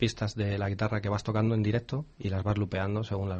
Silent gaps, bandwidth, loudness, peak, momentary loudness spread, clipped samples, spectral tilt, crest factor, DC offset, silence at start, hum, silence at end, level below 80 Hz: none; 8.4 kHz; -31 LUFS; -12 dBFS; 5 LU; under 0.1%; -7 dB/octave; 18 dB; under 0.1%; 0 s; none; 0 s; -52 dBFS